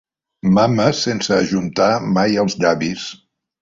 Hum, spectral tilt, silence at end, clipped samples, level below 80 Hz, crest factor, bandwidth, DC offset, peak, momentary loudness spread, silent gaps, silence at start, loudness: none; -5.5 dB/octave; 0.45 s; under 0.1%; -52 dBFS; 16 dB; 7.6 kHz; under 0.1%; -2 dBFS; 8 LU; none; 0.45 s; -17 LUFS